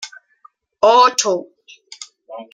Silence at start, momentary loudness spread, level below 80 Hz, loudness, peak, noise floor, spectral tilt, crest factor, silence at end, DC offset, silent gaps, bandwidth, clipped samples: 0 s; 25 LU; -70 dBFS; -14 LUFS; 0 dBFS; -52 dBFS; -1 dB/octave; 18 dB; 0.1 s; under 0.1%; none; 15 kHz; under 0.1%